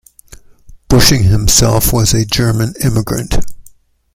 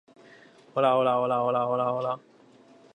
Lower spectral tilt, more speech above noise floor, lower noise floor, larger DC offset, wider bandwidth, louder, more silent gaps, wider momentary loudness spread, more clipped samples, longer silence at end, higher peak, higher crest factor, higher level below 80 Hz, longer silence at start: second, -4 dB/octave vs -7.5 dB/octave; about the same, 33 dB vs 30 dB; second, -43 dBFS vs -55 dBFS; neither; first, 17 kHz vs 9.4 kHz; first, -12 LUFS vs -26 LUFS; neither; about the same, 9 LU vs 10 LU; neither; second, 0.45 s vs 0.75 s; first, 0 dBFS vs -10 dBFS; second, 12 dB vs 18 dB; first, -24 dBFS vs -78 dBFS; about the same, 0.7 s vs 0.75 s